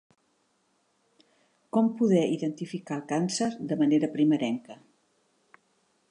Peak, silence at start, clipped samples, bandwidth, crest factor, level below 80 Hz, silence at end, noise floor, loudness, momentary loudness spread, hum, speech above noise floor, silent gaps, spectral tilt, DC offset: -12 dBFS; 1.75 s; under 0.1%; 10.5 kHz; 18 dB; -80 dBFS; 1.35 s; -71 dBFS; -27 LUFS; 10 LU; none; 45 dB; none; -6 dB/octave; under 0.1%